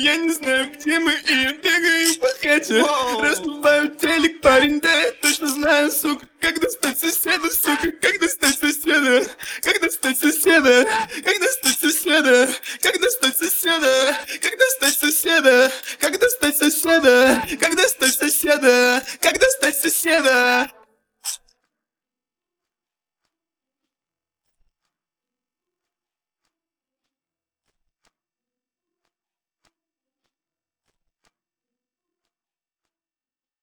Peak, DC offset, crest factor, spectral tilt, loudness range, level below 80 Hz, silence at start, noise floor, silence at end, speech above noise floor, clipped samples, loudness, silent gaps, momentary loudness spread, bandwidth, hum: -2 dBFS; under 0.1%; 18 dB; -0.5 dB/octave; 3 LU; -54 dBFS; 0 s; under -90 dBFS; 12.25 s; over 72 dB; under 0.1%; -17 LUFS; none; 6 LU; over 20 kHz; none